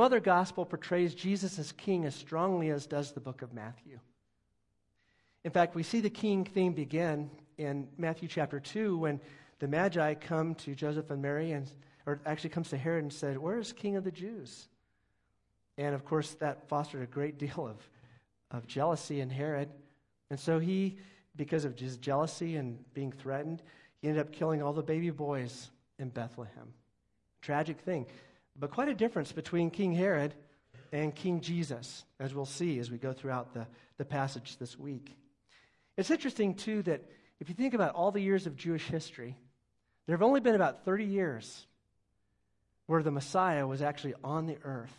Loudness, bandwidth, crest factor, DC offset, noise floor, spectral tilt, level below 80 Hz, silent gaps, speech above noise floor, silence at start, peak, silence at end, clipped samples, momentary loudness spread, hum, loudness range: -34 LUFS; 11.5 kHz; 22 dB; under 0.1%; -77 dBFS; -6.5 dB/octave; -76 dBFS; none; 43 dB; 0 s; -12 dBFS; 0.05 s; under 0.1%; 14 LU; none; 6 LU